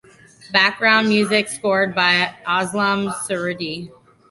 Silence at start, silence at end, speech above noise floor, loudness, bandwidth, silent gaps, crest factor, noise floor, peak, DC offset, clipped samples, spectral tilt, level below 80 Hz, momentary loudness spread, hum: 0.45 s; 0.4 s; 27 dB; -18 LUFS; 12 kHz; none; 18 dB; -46 dBFS; -2 dBFS; under 0.1%; under 0.1%; -3.5 dB/octave; -62 dBFS; 9 LU; none